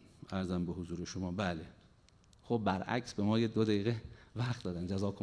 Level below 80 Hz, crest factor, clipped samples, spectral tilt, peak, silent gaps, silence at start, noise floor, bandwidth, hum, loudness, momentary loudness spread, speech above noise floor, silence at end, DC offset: -62 dBFS; 20 dB; under 0.1%; -6.5 dB/octave; -18 dBFS; none; 0.3 s; -64 dBFS; 10.5 kHz; none; -36 LUFS; 10 LU; 29 dB; 0 s; under 0.1%